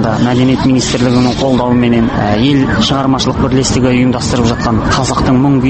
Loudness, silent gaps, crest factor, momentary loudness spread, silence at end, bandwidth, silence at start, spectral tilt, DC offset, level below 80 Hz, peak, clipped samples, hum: -11 LUFS; none; 10 dB; 2 LU; 0 s; 8.8 kHz; 0 s; -5.5 dB/octave; under 0.1%; -28 dBFS; 0 dBFS; under 0.1%; none